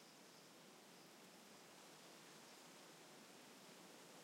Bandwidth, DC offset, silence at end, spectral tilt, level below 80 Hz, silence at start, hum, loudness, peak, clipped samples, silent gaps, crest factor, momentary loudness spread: 16 kHz; under 0.1%; 0 s; -2.5 dB/octave; under -90 dBFS; 0 s; none; -62 LUFS; -48 dBFS; under 0.1%; none; 14 dB; 2 LU